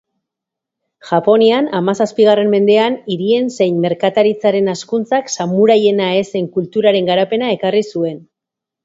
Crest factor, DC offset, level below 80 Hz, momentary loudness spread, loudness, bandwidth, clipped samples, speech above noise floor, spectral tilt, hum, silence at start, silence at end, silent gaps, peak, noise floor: 14 dB; under 0.1%; -62 dBFS; 8 LU; -14 LUFS; 7.8 kHz; under 0.1%; 70 dB; -5.5 dB/octave; none; 1.05 s; 0.65 s; none; 0 dBFS; -83 dBFS